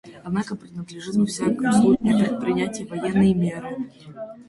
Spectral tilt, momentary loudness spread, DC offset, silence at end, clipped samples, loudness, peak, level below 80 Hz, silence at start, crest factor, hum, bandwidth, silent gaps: -6.5 dB/octave; 16 LU; under 0.1%; 0.05 s; under 0.1%; -22 LUFS; -6 dBFS; -54 dBFS; 0.05 s; 16 dB; none; 11.5 kHz; none